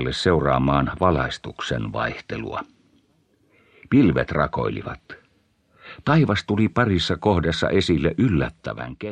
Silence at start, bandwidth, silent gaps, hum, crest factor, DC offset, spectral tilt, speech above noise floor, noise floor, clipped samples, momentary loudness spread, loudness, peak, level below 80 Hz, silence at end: 0 s; 9.8 kHz; none; none; 20 dB; under 0.1%; -6.5 dB/octave; 42 dB; -63 dBFS; under 0.1%; 13 LU; -22 LUFS; -4 dBFS; -40 dBFS; 0 s